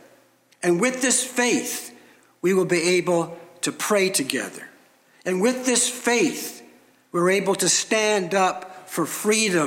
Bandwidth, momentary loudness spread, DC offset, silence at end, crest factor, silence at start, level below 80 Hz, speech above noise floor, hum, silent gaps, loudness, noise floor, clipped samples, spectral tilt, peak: 17 kHz; 12 LU; under 0.1%; 0 s; 20 dB; 0.6 s; -78 dBFS; 36 dB; none; none; -22 LUFS; -57 dBFS; under 0.1%; -3 dB/octave; -2 dBFS